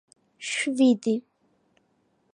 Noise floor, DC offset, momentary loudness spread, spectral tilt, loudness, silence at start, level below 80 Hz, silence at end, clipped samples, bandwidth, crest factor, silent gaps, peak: -69 dBFS; under 0.1%; 10 LU; -4 dB/octave; -24 LUFS; 0.4 s; -82 dBFS; 1.15 s; under 0.1%; 10.5 kHz; 18 dB; none; -10 dBFS